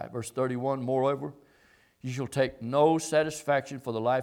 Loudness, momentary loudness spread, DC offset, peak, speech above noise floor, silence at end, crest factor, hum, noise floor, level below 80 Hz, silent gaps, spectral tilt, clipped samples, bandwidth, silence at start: -29 LUFS; 11 LU; under 0.1%; -10 dBFS; 35 dB; 0 s; 18 dB; none; -63 dBFS; -66 dBFS; none; -5.5 dB/octave; under 0.1%; 17 kHz; 0 s